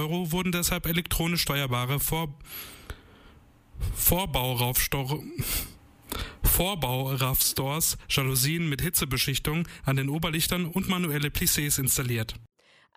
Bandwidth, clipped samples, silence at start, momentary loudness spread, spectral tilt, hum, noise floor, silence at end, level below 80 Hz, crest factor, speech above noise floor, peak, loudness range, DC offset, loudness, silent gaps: 15.5 kHz; under 0.1%; 0 s; 13 LU; -3.5 dB/octave; none; -55 dBFS; 0.5 s; -40 dBFS; 18 dB; 27 dB; -10 dBFS; 3 LU; under 0.1%; -26 LUFS; none